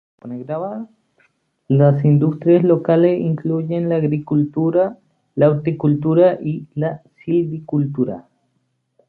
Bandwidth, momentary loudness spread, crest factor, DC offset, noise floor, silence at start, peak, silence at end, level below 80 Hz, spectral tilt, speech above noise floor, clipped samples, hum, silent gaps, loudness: 4.3 kHz; 13 LU; 16 dB; under 0.1%; -68 dBFS; 0.25 s; -2 dBFS; 0.85 s; -60 dBFS; -12 dB/octave; 52 dB; under 0.1%; none; none; -18 LUFS